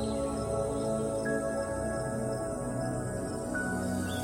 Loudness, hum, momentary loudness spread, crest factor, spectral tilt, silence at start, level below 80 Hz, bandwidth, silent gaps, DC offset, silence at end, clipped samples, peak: -33 LUFS; none; 3 LU; 14 dB; -5.5 dB/octave; 0 s; -48 dBFS; 16 kHz; none; under 0.1%; 0 s; under 0.1%; -18 dBFS